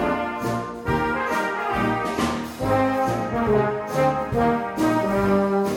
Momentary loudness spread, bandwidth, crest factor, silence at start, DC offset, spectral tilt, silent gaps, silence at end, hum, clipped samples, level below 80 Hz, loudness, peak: 5 LU; 18 kHz; 16 dB; 0 s; under 0.1%; -6.5 dB/octave; none; 0 s; none; under 0.1%; -42 dBFS; -23 LUFS; -8 dBFS